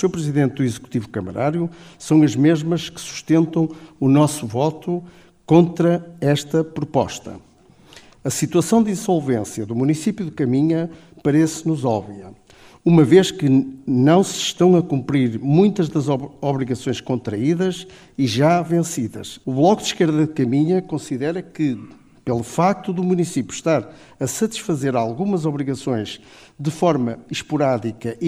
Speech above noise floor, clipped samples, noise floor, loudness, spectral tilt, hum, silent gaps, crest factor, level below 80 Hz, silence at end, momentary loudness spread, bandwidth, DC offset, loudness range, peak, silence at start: 30 dB; under 0.1%; -49 dBFS; -19 LUFS; -6 dB/octave; none; none; 18 dB; -56 dBFS; 0 s; 11 LU; 15.5 kHz; under 0.1%; 5 LU; -2 dBFS; 0 s